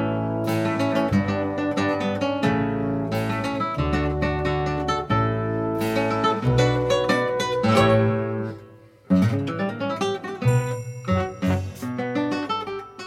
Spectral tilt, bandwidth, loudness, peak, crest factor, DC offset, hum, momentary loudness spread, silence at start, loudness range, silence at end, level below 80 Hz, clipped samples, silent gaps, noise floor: -6.5 dB/octave; 16.5 kHz; -23 LUFS; -4 dBFS; 18 dB; under 0.1%; none; 7 LU; 0 s; 4 LU; 0 s; -42 dBFS; under 0.1%; none; -47 dBFS